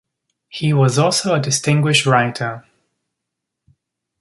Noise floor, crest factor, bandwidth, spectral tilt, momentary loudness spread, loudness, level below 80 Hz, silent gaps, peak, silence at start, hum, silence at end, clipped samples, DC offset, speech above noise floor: -80 dBFS; 18 dB; 11.5 kHz; -4.5 dB/octave; 12 LU; -16 LUFS; -58 dBFS; none; -2 dBFS; 0.55 s; none; 1.6 s; under 0.1%; under 0.1%; 64 dB